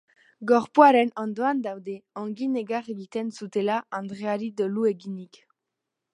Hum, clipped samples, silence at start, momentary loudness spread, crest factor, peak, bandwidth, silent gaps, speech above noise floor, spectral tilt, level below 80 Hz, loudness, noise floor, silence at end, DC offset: none; under 0.1%; 0.4 s; 18 LU; 24 dB; -2 dBFS; 11 kHz; none; 60 dB; -6.5 dB/octave; -76 dBFS; -25 LUFS; -84 dBFS; 0.9 s; under 0.1%